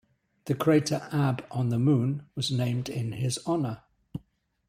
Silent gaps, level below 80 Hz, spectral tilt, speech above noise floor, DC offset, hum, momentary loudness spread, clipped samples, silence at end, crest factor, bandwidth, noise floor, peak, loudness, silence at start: none; -62 dBFS; -6 dB/octave; 39 dB; under 0.1%; none; 19 LU; under 0.1%; 0.5 s; 18 dB; 15.5 kHz; -65 dBFS; -10 dBFS; -28 LUFS; 0.45 s